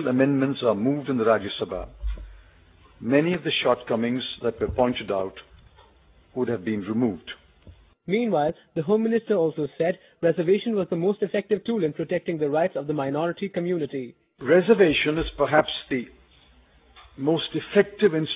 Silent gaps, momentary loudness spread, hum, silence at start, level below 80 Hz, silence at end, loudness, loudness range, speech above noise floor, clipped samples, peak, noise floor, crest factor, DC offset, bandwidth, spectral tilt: none; 11 LU; none; 0 s; -46 dBFS; 0 s; -24 LUFS; 5 LU; 33 dB; under 0.1%; -4 dBFS; -56 dBFS; 20 dB; under 0.1%; 4 kHz; -10 dB/octave